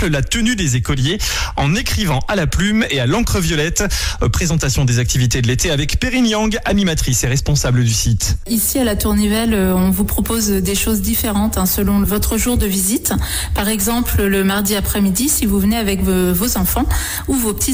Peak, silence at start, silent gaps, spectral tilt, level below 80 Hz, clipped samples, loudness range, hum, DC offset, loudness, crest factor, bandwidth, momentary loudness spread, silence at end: -6 dBFS; 0 s; none; -4.5 dB/octave; -24 dBFS; under 0.1%; 1 LU; none; under 0.1%; -16 LUFS; 10 dB; 17.5 kHz; 3 LU; 0 s